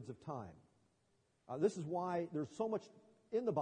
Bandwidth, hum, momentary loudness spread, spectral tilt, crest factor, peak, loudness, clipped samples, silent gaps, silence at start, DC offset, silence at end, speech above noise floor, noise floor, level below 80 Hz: 10 kHz; none; 11 LU; -7.5 dB/octave; 20 dB; -22 dBFS; -41 LUFS; under 0.1%; none; 0 s; under 0.1%; 0 s; 38 dB; -78 dBFS; -82 dBFS